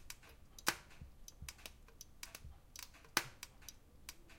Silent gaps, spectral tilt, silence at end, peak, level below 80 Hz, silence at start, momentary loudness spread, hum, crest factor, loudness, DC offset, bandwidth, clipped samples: none; -1 dB/octave; 0 s; -10 dBFS; -62 dBFS; 0 s; 18 LU; none; 38 dB; -46 LUFS; under 0.1%; 17 kHz; under 0.1%